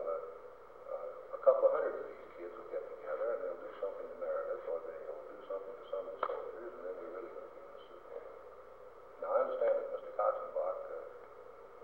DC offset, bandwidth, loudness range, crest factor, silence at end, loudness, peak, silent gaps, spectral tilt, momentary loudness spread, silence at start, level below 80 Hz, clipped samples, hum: under 0.1%; 4.3 kHz; 8 LU; 24 dB; 0 s; -38 LUFS; -14 dBFS; none; -6 dB/octave; 20 LU; 0 s; -74 dBFS; under 0.1%; none